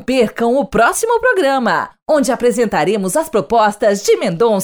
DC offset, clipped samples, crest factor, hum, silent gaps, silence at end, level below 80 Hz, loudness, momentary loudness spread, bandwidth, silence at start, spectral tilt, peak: under 0.1%; under 0.1%; 12 dB; none; 2.02-2.06 s; 0 s; -46 dBFS; -14 LUFS; 4 LU; over 20 kHz; 0 s; -4 dB/octave; -2 dBFS